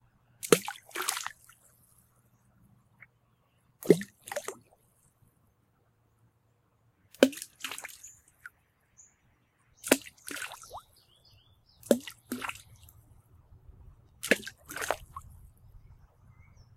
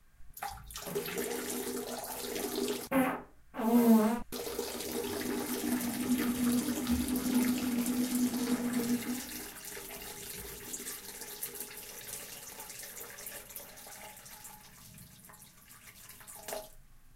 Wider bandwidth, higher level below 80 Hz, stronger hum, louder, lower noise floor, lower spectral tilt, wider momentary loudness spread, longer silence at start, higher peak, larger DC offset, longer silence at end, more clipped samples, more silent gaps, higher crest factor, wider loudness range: about the same, 16.5 kHz vs 16.5 kHz; second, -64 dBFS vs -58 dBFS; neither; about the same, -32 LUFS vs -34 LUFS; first, -70 dBFS vs -56 dBFS; about the same, -3.5 dB/octave vs -4 dB/octave; first, 23 LU vs 19 LU; first, 0.45 s vs 0.2 s; first, -2 dBFS vs -14 dBFS; neither; first, 1 s vs 0 s; neither; neither; first, 34 dB vs 20 dB; second, 4 LU vs 15 LU